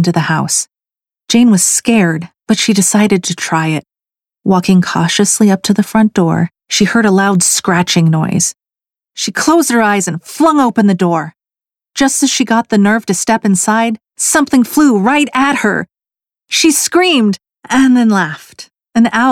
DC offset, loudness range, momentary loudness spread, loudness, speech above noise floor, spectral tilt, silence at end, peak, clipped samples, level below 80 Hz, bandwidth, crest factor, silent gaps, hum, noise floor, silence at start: under 0.1%; 2 LU; 8 LU; -11 LUFS; over 79 dB; -4 dB/octave; 0 s; 0 dBFS; under 0.1%; -52 dBFS; 16.5 kHz; 12 dB; none; none; under -90 dBFS; 0 s